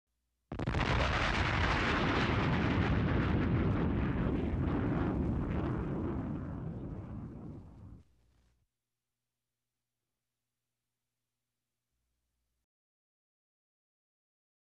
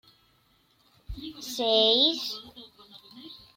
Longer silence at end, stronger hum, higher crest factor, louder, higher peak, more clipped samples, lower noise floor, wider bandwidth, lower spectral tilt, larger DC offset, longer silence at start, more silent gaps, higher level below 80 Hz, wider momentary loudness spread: first, 6.65 s vs 0.2 s; first, 60 Hz at -60 dBFS vs none; second, 16 dB vs 22 dB; second, -33 LUFS vs -23 LUFS; second, -20 dBFS vs -8 dBFS; neither; first, under -90 dBFS vs -66 dBFS; second, 9.2 kHz vs 16.5 kHz; first, -7 dB/octave vs -3 dB/octave; neither; second, 0.5 s vs 1.1 s; neither; first, -44 dBFS vs -52 dBFS; second, 14 LU vs 26 LU